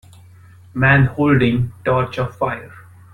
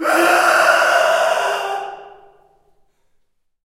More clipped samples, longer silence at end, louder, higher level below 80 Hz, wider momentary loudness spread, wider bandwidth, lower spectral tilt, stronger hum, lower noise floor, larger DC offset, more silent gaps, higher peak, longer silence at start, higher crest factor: neither; second, 0.35 s vs 1.55 s; second, -17 LUFS vs -14 LUFS; first, -42 dBFS vs -64 dBFS; second, 10 LU vs 13 LU; second, 5.8 kHz vs 16 kHz; first, -8.5 dB/octave vs -1 dB/octave; neither; second, -44 dBFS vs -62 dBFS; neither; neither; about the same, -2 dBFS vs 0 dBFS; first, 0.75 s vs 0 s; about the same, 16 dB vs 18 dB